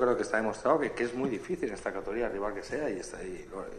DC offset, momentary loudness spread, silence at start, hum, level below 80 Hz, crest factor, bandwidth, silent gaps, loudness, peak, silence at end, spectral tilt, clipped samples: under 0.1%; 11 LU; 0 s; none; -54 dBFS; 20 dB; 12 kHz; none; -32 LUFS; -12 dBFS; 0 s; -5.5 dB/octave; under 0.1%